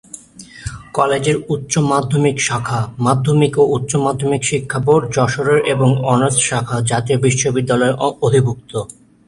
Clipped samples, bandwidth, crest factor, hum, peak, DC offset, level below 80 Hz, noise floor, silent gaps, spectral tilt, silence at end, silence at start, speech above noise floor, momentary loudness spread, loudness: under 0.1%; 11.5 kHz; 16 dB; none; 0 dBFS; under 0.1%; -46 dBFS; -39 dBFS; none; -5 dB/octave; 0.35 s; 0.15 s; 23 dB; 10 LU; -16 LUFS